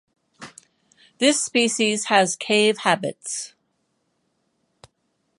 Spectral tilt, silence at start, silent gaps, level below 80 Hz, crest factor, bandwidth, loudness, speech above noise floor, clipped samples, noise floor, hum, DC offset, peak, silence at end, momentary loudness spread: -2.5 dB/octave; 0.4 s; none; -74 dBFS; 22 dB; 11.5 kHz; -20 LUFS; 51 dB; under 0.1%; -72 dBFS; none; under 0.1%; -2 dBFS; 1.9 s; 20 LU